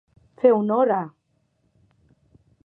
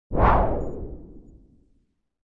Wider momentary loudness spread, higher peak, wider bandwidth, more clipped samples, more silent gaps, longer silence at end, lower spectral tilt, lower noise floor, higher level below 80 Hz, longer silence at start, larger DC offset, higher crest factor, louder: second, 9 LU vs 21 LU; about the same, -4 dBFS vs -4 dBFS; second, 3.7 kHz vs 4.9 kHz; neither; neither; first, 1.6 s vs 1.15 s; about the same, -10.5 dB/octave vs -9.5 dB/octave; about the same, -69 dBFS vs -68 dBFS; second, -70 dBFS vs -30 dBFS; first, 0.45 s vs 0.1 s; neither; about the same, 20 dB vs 20 dB; about the same, -21 LUFS vs -23 LUFS